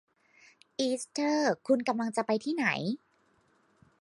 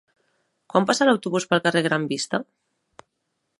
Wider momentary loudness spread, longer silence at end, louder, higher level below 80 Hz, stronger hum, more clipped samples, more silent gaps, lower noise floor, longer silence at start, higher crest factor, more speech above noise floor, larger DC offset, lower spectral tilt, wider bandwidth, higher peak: about the same, 7 LU vs 7 LU; about the same, 1.05 s vs 1.15 s; second, -30 LUFS vs -22 LUFS; second, -82 dBFS vs -70 dBFS; neither; neither; neither; second, -69 dBFS vs -76 dBFS; about the same, 0.8 s vs 0.75 s; about the same, 18 dB vs 22 dB; second, 39 dB vs 55 dB; neither; about the same, -4.5 dB/octave vs -4.5 dB/octave; about the same, 11.5 kHz vs 11.5 kHz; second, -14 dBFS vs -2 dBFS